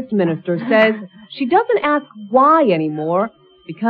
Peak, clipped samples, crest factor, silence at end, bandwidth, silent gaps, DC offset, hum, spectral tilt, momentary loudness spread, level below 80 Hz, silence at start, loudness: -2 dBFS; under 0.1%; 16 dB; 0 s; 5.6 kHz; none; under 0.1%; none; -9 dB/octave; 13 LU; -64 dBFS; 0 s; -16 LUFS